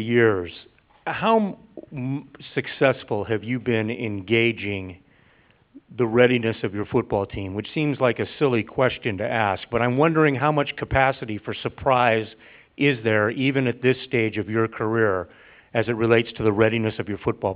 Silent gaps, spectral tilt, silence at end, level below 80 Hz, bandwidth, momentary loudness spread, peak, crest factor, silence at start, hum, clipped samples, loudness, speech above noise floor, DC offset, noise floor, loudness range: none; -10.5 dB/octave; 0 s; -48 dBFS; 4 kHz; 11 LU; -2 dBFS; 20 dB; 0 s; none; under 0.1%; -23 LUFS; 36 dB; under 0.1%; -58 dBFS; 3 LU